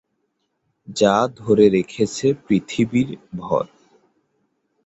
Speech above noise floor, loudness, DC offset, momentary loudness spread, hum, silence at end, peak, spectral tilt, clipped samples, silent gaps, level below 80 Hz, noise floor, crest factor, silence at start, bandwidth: 53 dB; -19 LUFS; under 0.1%; 11 LU; none; 1.2 s; -2 dBFS; -6 dB/octave; under 0.1%; none; -56 dBFS; -72 dBFS; 20 dB; 0.9 s; 8.2 kHz